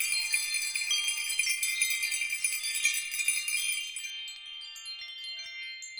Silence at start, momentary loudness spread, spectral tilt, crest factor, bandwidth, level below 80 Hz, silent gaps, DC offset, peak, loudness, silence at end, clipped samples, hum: 0 s; 12 LU; 6 dB/octave; 20 dB; over 20 kHz; -74 dBFS; none; under 0.1%; -12 dBFS; -29 LUFS; 0 s; under 0.1%; none